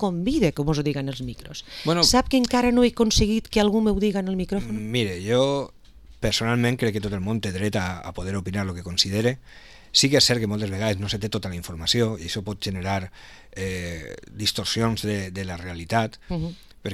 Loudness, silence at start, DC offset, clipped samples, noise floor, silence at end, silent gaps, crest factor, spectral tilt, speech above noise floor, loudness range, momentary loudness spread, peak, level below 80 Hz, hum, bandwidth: -23 LUFS; 0 s; 0.2%; under 0.1%; -47 dBFS; 0 s; none; 20 dB; -4.5 dB/octave; 24 dB; 6 LU; 14 LU; -4 dBFS; -40 dBFS; none; 15.5 kHz